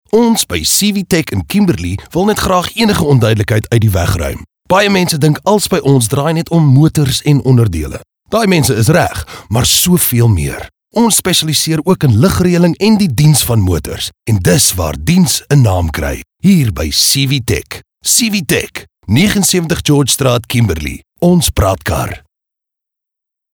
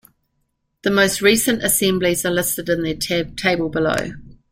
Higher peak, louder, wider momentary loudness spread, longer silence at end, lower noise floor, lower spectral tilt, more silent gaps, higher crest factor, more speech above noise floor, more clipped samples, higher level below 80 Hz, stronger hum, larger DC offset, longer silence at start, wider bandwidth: about the same, 0 dBFS vs -2 dBFS; first, -11 LUFS vs -18 LUFS; about the same, 9 LU vs 7 LU; first, 1.35 s vs 0.2 s; first, -81 dBFS vs -70 dBFS; about the same, -4.5 dB/octave vs -3.5 dB/octave; neither; second, 12 dB vs 18 dB; first, 70 dB vs 52 dB; neither; first, -30 dBFS vs -46 dBFS; neither; neither; second, 0.15 s vs 0.85 s; first, over 20 kHz vs 16.5 kHz